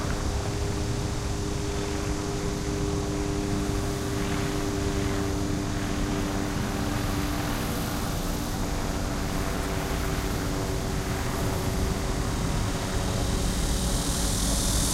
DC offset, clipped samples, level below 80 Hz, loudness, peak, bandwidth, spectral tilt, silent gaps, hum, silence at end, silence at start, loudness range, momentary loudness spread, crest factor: under 0.1%; under 0.1%; -32 dBFS; -29 LUFS; -12 dBFS; 16 kHz; -4.5 dB/octave; none; none; 0 s; 0 s; 2 LU; 3 LU; 16 dB